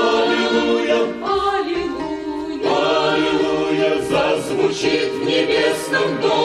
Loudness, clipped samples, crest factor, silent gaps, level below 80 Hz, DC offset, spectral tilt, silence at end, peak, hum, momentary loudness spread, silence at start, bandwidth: -18 LUFS; under 0.1%; 12 dB; none; -48 dBFS; under 0.1%; -4 dB/octave; 0 s; -6 dBFS; none; 6 LU; 0 s; 14 kHz